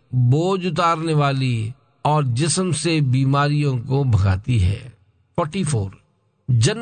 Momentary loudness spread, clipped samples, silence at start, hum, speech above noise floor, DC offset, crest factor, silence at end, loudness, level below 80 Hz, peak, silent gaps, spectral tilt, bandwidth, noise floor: 8 LU; under 0.1%; 0.1 s; none; 30 dB; under 0.1%; 14 dB; 0 s; -20 LUFS; -48 dBFS; -4 dBFS; none; -6 dB/octave; 9.4 kHz; -49 dBFS